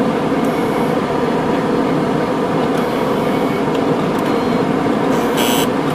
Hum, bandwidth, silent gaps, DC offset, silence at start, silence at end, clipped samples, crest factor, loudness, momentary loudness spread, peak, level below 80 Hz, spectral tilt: none; 15.5 kHz; none; under 0.1%; 0 s; 0 s; under 0.1%; 14 dB; -16 LUFS; 2 LU; -2 dBFS; -44 dBFS; -5.5 dB/octave